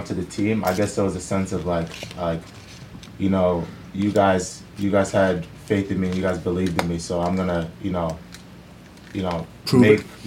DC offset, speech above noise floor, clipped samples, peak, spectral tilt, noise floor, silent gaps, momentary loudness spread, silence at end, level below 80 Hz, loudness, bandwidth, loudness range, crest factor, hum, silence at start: under 0.1%; 22 dB; under 0.1%; -2 dBFS; -6 dB/octave; -44 dBFS; none; 14 LU; 0 s; -48 dBFS; -23 LUFS; 17 kHz; 3 LU; 20 dB; none; 0 s